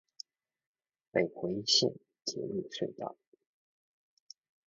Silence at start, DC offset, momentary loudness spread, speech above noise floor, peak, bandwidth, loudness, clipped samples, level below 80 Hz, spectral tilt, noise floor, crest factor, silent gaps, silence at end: 1.15 s; under 0.1%; 20 LU; 21 dB; -12 dBFS; 7.4 kHz; -33 LUFS; under 0.1%; -74 dBFS; -3 dB/octave; -54 dBFS; 26 dB; none; 1.55 s